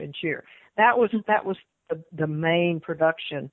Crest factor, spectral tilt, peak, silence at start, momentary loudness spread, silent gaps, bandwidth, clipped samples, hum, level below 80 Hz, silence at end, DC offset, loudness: 18 dB; -9.5 dB/octave; -6 dBFS; 0 s; 15 LU; none; 4.1 kHz; under 0.1%; none; -68 dBFS; 0.05 s; under 0.1%; -24 LUFS